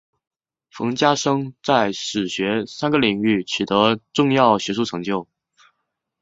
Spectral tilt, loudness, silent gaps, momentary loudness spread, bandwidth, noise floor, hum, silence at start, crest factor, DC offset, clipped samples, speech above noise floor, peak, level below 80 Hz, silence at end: -4.5 dB/octave; -20 LUFS; none; 8 LU; 7.8 kHz; -77 dBFS; none; 0.75 s; 20 dB; under 0.1%; under 0.1%; 57 dB; -2 dBFS; -60 dBFS; 1 s